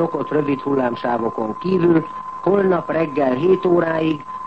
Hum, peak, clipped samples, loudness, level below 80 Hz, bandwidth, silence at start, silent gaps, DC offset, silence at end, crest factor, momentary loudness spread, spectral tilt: none; -4 dBFS; under 0.1%; -19 LUFS; -56 dBFS; 6 kHz; 0 s; none; 0.4%; 0 s; 14 dB; 6 LU; -9 dB/octave